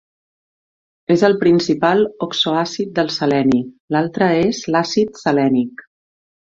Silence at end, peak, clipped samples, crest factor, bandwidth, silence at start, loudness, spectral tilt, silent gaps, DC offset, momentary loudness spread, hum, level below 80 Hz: 0.8 s; -2 dBFS; under 0.1%; 16 dB; 7.8 kHz; 1.1 s; -17 LUFS; -5.5 dB/octave; 3.80-3.88 s; under 0.1%; 6 LU; none; -56 dBFS